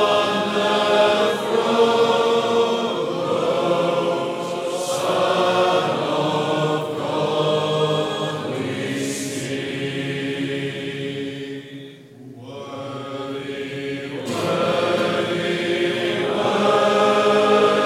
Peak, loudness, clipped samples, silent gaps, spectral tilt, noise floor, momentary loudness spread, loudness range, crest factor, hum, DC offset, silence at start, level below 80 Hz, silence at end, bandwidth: -4 dBFS; -20 LUFS; under 0.1%; none; -4.5 dB/octave; -41 dBFS; 12 LU; 10 LU; 16 dB; none; under 0.1%; 0 s; -66 dBFS; 0 s; 15.5 kHz